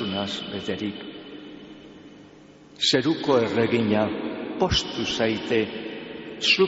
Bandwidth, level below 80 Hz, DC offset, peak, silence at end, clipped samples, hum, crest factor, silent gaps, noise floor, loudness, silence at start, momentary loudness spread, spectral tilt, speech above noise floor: 8 kHz; -48 dBFS; under 0.1%; -8 dBFS; 0 s; under 0.1%; none; 18 dB; none; -49 dBFS; -24 LUFS; 0 s; 20 LU; -3 dB/octave; 25 dB